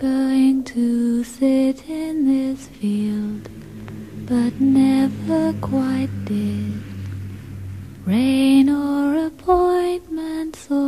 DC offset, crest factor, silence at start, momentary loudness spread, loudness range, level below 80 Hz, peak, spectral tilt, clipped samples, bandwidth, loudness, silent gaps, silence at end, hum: 0.2%; 16 dB; 0 s; 18 LU; 3 LU; -48 dBFS; -4 dBFS; -7 dB/octave; under 0.1%; 13.5 kHz; -20 LUFS; none; 0 s; none